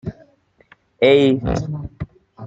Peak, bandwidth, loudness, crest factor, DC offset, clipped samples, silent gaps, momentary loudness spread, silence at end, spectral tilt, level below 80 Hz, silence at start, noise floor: -2 dBFS; 7.8 kHz; -17 LUFS; 18 dB; under 0.1%; under 0.1%; none; 21 LU; 0 s; -7 dB/octave; -40 dBFS; 0.05 s; -54 dBFS